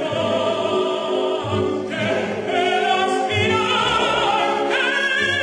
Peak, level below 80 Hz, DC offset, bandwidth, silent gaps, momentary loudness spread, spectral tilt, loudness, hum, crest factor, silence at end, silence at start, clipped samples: -6 dBFS; -52 dBFS; under 0.1%; 10.5 kHz; none; 4 LU; -4 dB/octave; -19 LUFS; none; 14 dB; 0 s; 0 s; under 0.1%